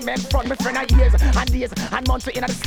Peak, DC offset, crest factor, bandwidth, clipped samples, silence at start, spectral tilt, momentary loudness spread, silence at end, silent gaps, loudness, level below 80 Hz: -4 dBFS; under 0.1%; 14 dB; 15 kHz; under 0.1%; 0 s; -5 dB/octave; 7 LU; 0 s; none; -20 LUFS; -20 dBFS